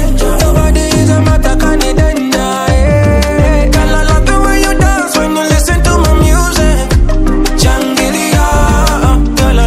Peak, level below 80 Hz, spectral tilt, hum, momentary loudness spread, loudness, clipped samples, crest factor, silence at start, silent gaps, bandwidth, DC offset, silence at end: 0 dBFS; -10 dBFS; -5 dB/octave; none; 3 LU; -10 LUFS; 0.2%; 8 dB; 0 s; none; 15.5 kHz; under 0.1%; 0 s